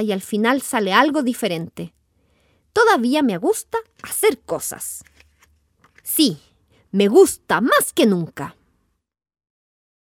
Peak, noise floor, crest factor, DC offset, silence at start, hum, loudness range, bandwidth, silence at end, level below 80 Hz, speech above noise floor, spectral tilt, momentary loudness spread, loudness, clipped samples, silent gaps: -2 dBFS; -69 dBFS; 20 dB; under 0.1%; 0 s; none; 5 LU; 18 kHz; 1.65 s; -60 dBFS; 50 dB; -4 dB/octave; 17 LU; -19 LUFS; under 0.1%; none